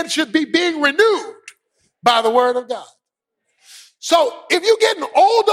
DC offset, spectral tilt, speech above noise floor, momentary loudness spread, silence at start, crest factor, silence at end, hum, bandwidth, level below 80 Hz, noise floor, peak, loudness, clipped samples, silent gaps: under 0.1%; -1.5 dB/octave; 63 dB; 11 LU; 0 s; 16 dB; 0 s; none; 16 kHz; -66 dBFS; -79 dBFS; -2 dBFS; -16 LUFS; under 0.1%; none